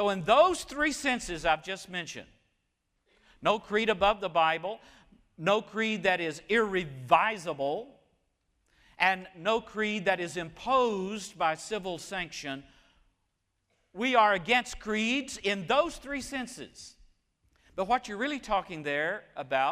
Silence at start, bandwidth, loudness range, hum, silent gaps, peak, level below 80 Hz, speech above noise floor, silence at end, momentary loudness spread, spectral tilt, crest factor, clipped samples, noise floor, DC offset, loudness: 0 s; 15.5 kHz; 4 LU; none; none; -8 dBFS; -58 dBFS; 49 dB; 0 s; 12 LU; -3.5 dB/octave; 22 dB; under 0.1%; -79 dBFS; under 0.1%; -29 LUFS